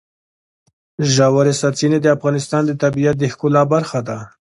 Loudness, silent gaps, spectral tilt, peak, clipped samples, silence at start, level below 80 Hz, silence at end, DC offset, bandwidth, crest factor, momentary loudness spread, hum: -16 LUFS; none; -5.5 dB/octave; 0 dBFS; under 0.1%; 1 s; -54 dBFS; 0.15 s; under 0.1%; 11.5 kHz; 16 dB; 8 LU; none